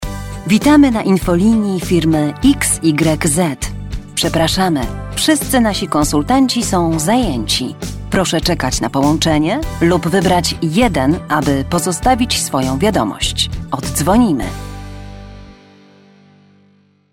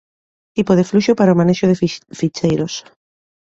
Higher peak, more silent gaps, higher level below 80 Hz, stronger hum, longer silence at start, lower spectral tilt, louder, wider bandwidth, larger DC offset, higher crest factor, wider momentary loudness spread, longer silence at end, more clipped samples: about the same, 0 dBFS vs -2 dBFS; neither; first, -30 dBFS vs -50 dBFS; first, 50 Hz at -40 dBFS vs none; second, 0 s vs 0.55 s; second, -4.5 dB/octave vs -6.5 dB/octave; about the same, -14 LUFS vs -16 LUFS; first, 17 kHz vs 7.8 kHz; neither; about the same, 14 dB vs 16 dB; about the same, 10 LU vs 11 LU; first, 1.6 s vs 0.8 s; neither